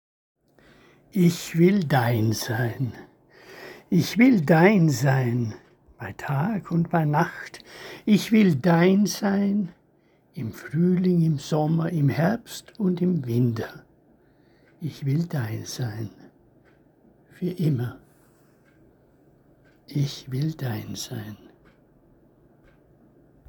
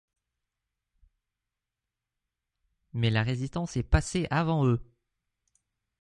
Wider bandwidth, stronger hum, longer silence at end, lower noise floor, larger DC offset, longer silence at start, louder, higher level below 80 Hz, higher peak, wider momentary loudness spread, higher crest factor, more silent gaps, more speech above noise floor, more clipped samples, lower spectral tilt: first, 20 kHz vs 11.5 kHz; neither; first, 2.15 s vs 1.15 s; second, -61 dBFS vs -88 dBFS; neither; second, 1.15 s vs 2.95 s; first, -23 LUFS vs -28 LUFS; second, -62 dBFS vs -40 dBFS; first, -4 dBFS vs -10 dBFS; first, 18 LU vs 7 LU; about the same, 20 dB vs 22 dB; neither; second, 39 dB vs 61 dB; neither; about the same, -6.5 dB/octave vs -6 dB/octave